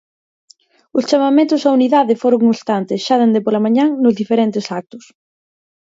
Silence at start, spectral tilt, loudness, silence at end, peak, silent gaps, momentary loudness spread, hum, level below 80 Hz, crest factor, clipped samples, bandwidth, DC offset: 0.95 s; -6 dB/octave; -15 LUFS; 0.95 s; -2 dBFS; none; 8 LU; none; -66 dBFS; 14 dB; under 0.1%; 7.8 kHz; under 0.1%